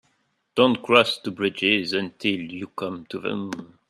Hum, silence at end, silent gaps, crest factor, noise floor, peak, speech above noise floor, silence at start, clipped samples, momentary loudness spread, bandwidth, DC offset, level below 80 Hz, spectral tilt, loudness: none; 0.25 s; none; 22 dB; -70 dBFS; -2 dBFS; 46 dB; 0.55 s; under 0.1%; 13 LU; 13 kHz; under 0.1%; -66 dBFS; -5 dB/octave; -23 LUFS